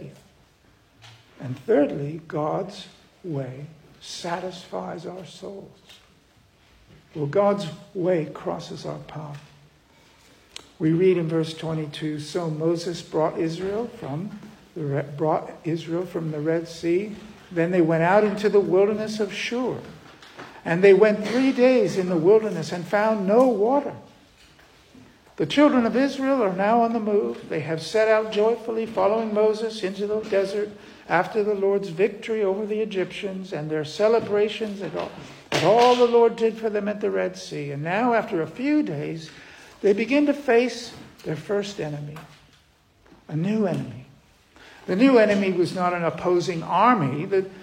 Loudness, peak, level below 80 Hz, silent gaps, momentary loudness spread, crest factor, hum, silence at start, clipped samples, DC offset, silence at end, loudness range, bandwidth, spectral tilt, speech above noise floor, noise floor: -23 LUFS; -4 dBFS; -62 dBFS; none; 18 LU; 20 dB; none; 0 s; under 0.1%; under 0.1%; 0 s; 9 LU; 15 kHz; -6.5 dB/octave; 36 dB; -59 dBFS